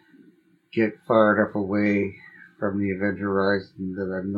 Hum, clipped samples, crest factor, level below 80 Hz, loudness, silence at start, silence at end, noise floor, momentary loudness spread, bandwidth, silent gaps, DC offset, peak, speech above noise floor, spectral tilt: none; under 0.1%; 20 dB; -66 dBFS; -24 LUFS; 0.75 s; 0 s; -58 dBFS; 11 LU; 5.6 kHz; none; under 0.1%; -4 dBFS; 35 dB; -9 dB/octave